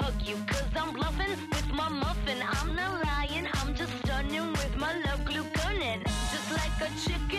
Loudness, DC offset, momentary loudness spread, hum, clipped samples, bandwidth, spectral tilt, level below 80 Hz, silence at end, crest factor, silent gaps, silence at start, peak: -31 LUFS; under 0.1%; 2 LU; none; under 0.1%; 14.5 kHz; -4.5 dB/octave; -36 dBFS; 0 s; 12 dB; none; 0 s; -20 dBFS